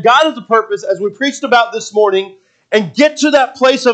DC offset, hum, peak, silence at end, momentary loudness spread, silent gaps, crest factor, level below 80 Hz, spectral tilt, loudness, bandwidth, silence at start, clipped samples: under 0.1%; none; 0 dBFS; 0 s; 7 LU; none; 12 dB; -66 dBFS; -3.5 dB/octave; -13 LUFS; 9 kHz; 0 s; under 0.1%